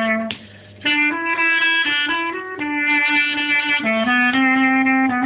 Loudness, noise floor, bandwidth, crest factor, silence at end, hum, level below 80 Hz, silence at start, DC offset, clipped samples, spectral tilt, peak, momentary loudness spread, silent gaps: -16 LUFS; -40 dBFS; 4 kHz; 12 dB; 0 s; none; -58 dBFS; 0 s; under 0.1%; under 0.1%; -6.5 dB/octave; -6 dBFS; 9 LU; none